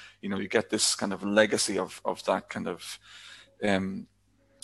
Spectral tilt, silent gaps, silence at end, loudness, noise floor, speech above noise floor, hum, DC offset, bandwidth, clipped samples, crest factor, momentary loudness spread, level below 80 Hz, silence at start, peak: -3 dB/octave; none; 0.6 s; -28 LUFS; -55 dBFS; 26 dB; 50 Hz at -55 dBFS; under 0.1%; 12.5 kHz; under 0.1%; 26 dB; 18 LU; -62 dBFS; 0 s; -4 dBFS